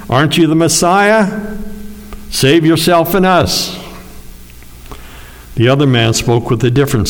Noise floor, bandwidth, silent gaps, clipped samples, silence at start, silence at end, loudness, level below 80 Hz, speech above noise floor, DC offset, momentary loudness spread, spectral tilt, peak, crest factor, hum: -33 dBFS; over 20 kHz; none; under 0.1%; 0 s; 0 s; -11 LUFS; -34 dBFS; 23 dB; under 0.1%; 21 LU; -5 dB/octave; 0 dBFS; 12 dB; 60 Hz at -40 dBFS